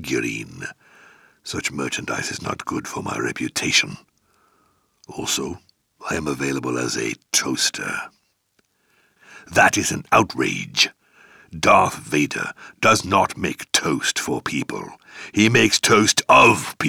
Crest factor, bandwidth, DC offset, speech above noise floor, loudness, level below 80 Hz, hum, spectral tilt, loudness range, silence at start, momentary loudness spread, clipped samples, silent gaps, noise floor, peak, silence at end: 20 dB; over 20 kHz; under 0.1%; 46 dB; -19 LUFS; -54 dBFS; none; -3 dB/octave; 6 LU; 0 s; 16 LU; under 0.1%; none; -67 dBFS; -2 dBFS; 0 s